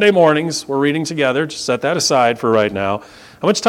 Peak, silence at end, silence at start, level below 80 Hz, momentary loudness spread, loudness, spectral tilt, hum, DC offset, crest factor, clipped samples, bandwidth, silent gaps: 0 dBFS; 0 s; 0 s; -56 dBFS; 8 LU; -16 LUFS; -4 dB/octave; none; under 0.1%; 16 dB; under 0.1%; 16.5 kHz; none